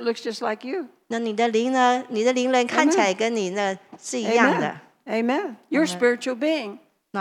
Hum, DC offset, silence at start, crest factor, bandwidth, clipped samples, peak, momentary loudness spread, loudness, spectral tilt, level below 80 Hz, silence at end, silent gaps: none; under 0.1%; 0 s; 20 dB; 13 kHz; under 0.1%; -2 dBFS; 12 LU; -23 LUFS; -4 dB/octave; -88 dBFS; 0 s; none